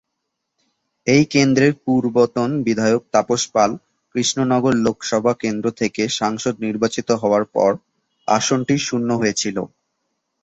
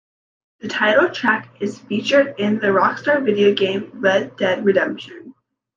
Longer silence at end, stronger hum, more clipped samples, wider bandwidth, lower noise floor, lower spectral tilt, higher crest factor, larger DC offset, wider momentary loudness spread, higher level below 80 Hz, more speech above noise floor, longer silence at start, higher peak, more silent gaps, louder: first, 0.75 s vs 0.45 s; neither; neither; first, 8.2 kHz vs 7.4 kHz; first, -77 dBFS vs -45 dBFS; about the same, -4.5 dB/octave vs -5.5 dB/octave; about the same, 18 dB vs 16 dB; neither; second, 7 LU vs 11 LU; first, -56 dBFS vs -68 dBFS; first, 59 dB vs 27 dB; first, 1.05 s vs 0.65 s; about the same, -2 dBFS vs -2 dBFS; neither; about the same, -19 LUFS vs -18 LUFS